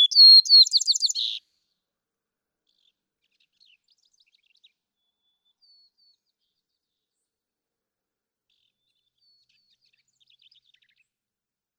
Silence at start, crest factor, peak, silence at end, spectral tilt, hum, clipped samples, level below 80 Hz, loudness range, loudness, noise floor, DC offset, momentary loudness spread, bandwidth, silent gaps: 0 s; 20 dB; -6 dBFS; 10.4 s; 8.5 dB/octave; none; under 0.1%; under -90 dBFS; 21 LU; -13 LUFS; under -90 dBFS; under 0.1%; 19 LU; 17.5 kHz; none